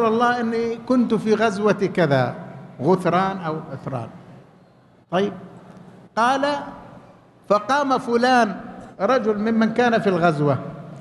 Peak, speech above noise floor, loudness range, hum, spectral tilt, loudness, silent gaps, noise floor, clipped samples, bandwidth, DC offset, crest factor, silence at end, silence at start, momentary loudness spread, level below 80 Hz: -4 dBFS; 33 dB; 7 LU; none; -6.5 dB/octave; -21 LUFS; none; -53 dBFS; under 0.1%; 12 kHz; under 0.1%; 16 dB; 0 s; 0 s; 13 LU; -60 dBFS